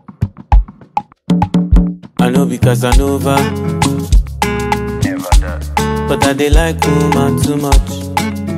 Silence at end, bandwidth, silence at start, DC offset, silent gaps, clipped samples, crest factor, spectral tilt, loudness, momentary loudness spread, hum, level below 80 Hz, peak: 0 s; 15.5 kHz; 0.1 s; under 0.1%; none; under 0.1%; 12 dB; -6 dB/octave; -14 LUFS; 6 LU; none; -16 dBFS; 0 dBFS